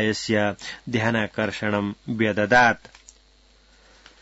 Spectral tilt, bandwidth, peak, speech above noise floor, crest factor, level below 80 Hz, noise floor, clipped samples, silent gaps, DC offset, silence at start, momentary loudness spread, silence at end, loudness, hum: -5 dB/octave; 8 kHz; -6 dBFS; 34 dB; 20 dB; -56 dBFS; -56 dBFS; under 0.1%; none; under 0.1%; 0 s; 11 LU; 1.45 s; -22 LUFS; none